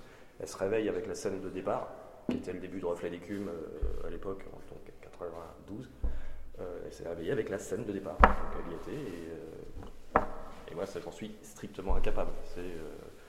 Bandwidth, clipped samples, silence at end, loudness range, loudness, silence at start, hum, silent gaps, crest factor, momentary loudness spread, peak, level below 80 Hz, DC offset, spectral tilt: 12 kHz; under 0.1%; 0 s; 9 LU; -36 LUFS; 0 s; none; none; 32 dB; 15 LU; 0 dBFS; -40 dBFS; under 0.1%; -6 dB/octave